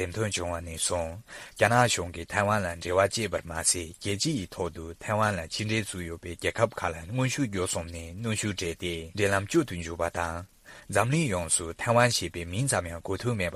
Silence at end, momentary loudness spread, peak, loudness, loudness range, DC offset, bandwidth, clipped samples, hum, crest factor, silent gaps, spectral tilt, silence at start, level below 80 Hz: 0 s; 10 LU; -6 dBFS; -28 LUFS; 3 LU; under 0.1%; 15.5 kHz; under 0.1%; none; 24 dB; none; -4 dB/octave; 0 s; -50 dBFS